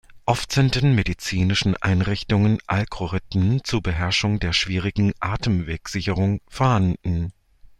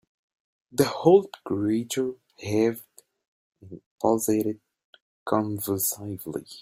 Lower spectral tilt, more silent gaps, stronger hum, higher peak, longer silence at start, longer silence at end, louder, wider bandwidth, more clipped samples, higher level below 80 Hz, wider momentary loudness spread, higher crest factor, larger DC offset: about the same, -5.5 dB/octave vs -5 dB/octave; second, none vs 3.28-3.52 s, 3.86-3.98 s, 4.84-4.93 s, 5.01-5.26 s; neither; about the same, -4 dBFS vs -6 dBFS; second, 0.1 s vs 0.75 s; first, 0.15 s vs 0 s; first, -22 LUFS vs -25 LUFS; second, 13 kHz vs 16.5 kHz; neither; first, -38 dBFS vs -64 dBFS; second, 6 LU vs 20 LU; about the same, 18 dB vs 20 dB; neither